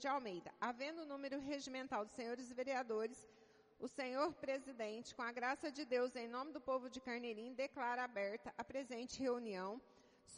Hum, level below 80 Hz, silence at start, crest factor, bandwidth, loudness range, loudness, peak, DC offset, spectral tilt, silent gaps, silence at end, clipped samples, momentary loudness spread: none; -80 dBFS; 0 s; 18 dB; 10.5 kHz; 2 LU; -45 LUFS; -26 dBFS; under 0.1%; -3.5 dB/octave; none; 0 s; under 0.1%; 7 LU